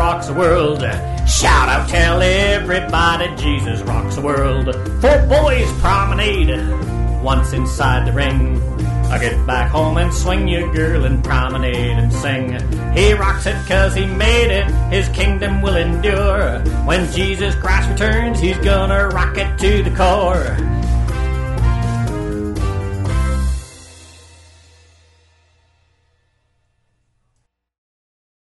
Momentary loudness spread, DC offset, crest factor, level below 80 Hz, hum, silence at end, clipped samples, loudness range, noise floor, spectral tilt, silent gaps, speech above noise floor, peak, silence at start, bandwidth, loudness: 7 LU; under 0.1%; 14 dB; -20 dBFS; none; 4.45 s; under 0.1%; 6 LU; -68 dBFS; -5.5 dB/octave; none; 53 dB; -2 dBFS; 0 s; 12 kHz; -16 LUFS